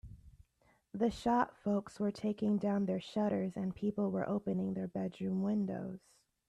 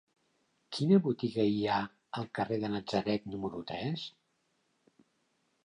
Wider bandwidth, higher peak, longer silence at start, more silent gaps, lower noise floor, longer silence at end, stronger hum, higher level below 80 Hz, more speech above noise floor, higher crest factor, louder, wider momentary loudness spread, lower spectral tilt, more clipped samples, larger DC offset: about the same, 10 kHz vs 10.5 kHz; second, -18 dBFS vs -14 dBFS; second, 0.05 s vs 0.7 s; neither; second, -73 dBFS vs -77 dBFS; second, 0.5 s vs 1.55 s; neither; about the same, -64 dBFS vs -68 dBFS; second, 37 dB vs 45 dB; about the same, 18 dB vs 20 dB; second, -36 LUFS vs -33 LUFS; second, 7 LU vs 13 LU; about the same, -8 dB/octave vs -7 dB/octave; neither; neither